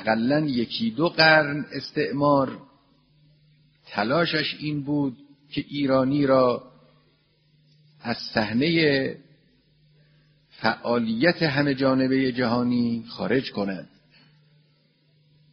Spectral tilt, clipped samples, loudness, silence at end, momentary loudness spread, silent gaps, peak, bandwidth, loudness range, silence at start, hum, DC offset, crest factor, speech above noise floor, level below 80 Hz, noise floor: -4 dB/octave; under 0.1%; -23 LUFS; 1.7 s; 11 LU; none; -2 dBFS; 6.2 kHz; 4 LU; 0 s; none; under 0.1%; 22 dB; 41 dB; -60 dBFS; -63 dBFS